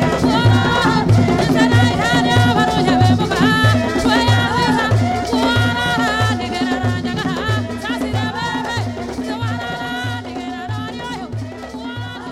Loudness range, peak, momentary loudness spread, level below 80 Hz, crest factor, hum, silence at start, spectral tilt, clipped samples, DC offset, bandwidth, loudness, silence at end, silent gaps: 9 LU; -4 dBFS; 13 LU; -36 dBFS; 12 dB; none; 0 s; -5.5 dB/octave; under 0.1%; under 0.1%; 14 kHz; -16 LUFS; 0 s; none